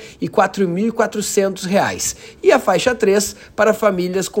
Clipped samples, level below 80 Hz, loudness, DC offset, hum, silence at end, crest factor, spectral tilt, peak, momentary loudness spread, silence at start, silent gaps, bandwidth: under 0.1%; -50 dBFS; -17 LUFS; under 0.1%; none; 0 s; 16 dB; -4 dB/octave; 0 dBFS; 5 LU; 0 s; none; 16.5 kHz